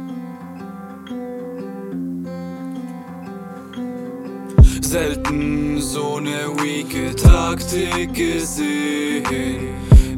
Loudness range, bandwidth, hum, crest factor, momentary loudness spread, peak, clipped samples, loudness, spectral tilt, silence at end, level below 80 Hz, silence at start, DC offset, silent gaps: 12 LU; 16.5 kHz; none; 18 dB; 19 LU; 0 dBFS; under 0.1%; -20 LUFS; -5.5 dB/octave; 0 s; -22 dBFS; 0 s; under 0.1%; none